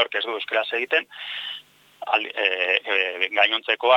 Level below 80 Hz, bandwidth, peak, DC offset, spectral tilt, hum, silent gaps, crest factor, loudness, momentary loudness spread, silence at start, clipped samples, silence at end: -86 dBFS; 16.5 kHz; -2 dBFS; under 0.1%; -2 dB/octave; none; none; 20 dB; -22 LUFS; 12 LU; 0 s; under 0.1%; 0 s